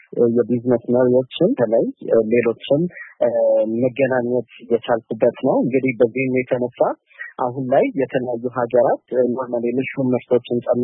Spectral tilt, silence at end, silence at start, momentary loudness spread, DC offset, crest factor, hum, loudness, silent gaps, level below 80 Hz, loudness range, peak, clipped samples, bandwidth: -12 dB/octave; 0 s; 0.1 s; 6 LU; under 0.1%; 16 dB; none; -19 LUFS; none; -64 dBFS; 2 LU; -4 dBFS; under 0.1%; 3.9 kHz